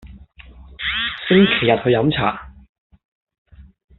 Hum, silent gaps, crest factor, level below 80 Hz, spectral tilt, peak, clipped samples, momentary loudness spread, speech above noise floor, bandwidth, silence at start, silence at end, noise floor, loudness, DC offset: none; 2.69-2.90 s, 3.05-3.27 s, 3.38-3.45 s; 20 dB; -44 dBFS; -3.5 dB/octave; -2 dBFS; under 0.1%; 10 LU; 27 dB; 4.3 kHz; 0.05 s; 0.35 s; -43 dBFS; -17 LUFS; under 0.1%